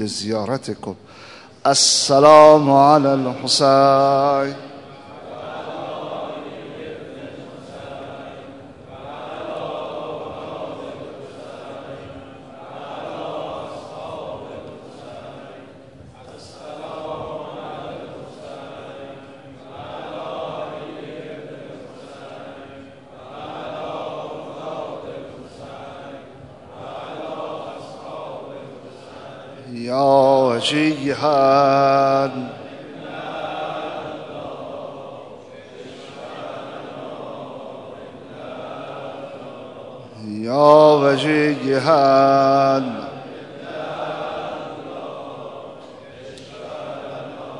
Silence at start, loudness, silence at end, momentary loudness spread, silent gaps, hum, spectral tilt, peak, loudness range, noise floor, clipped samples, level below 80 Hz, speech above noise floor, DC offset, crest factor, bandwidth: 0 s; -17 LUFS; 0 s; 24 LU; none; none; -4 dB/octave; 0 dBFS; 20 LU; -42 dBFS; under 0.1%; -62 dBFS; 28 dB; 0.1%; 22 dB; 11 kHz